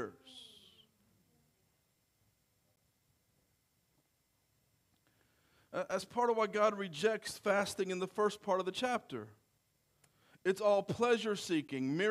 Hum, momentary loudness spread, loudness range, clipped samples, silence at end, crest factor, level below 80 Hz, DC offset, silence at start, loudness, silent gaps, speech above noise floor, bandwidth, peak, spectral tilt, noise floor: none; 14 LU; 8 LU; under 0.1%; 0 s; 20 dB; -78 dBFS; under 0.1%; 0 s; -35 LUFS; none; 44 dB; 15.5 kHz; -18 dBFS; -4.5 dB/octave; -78 dBFS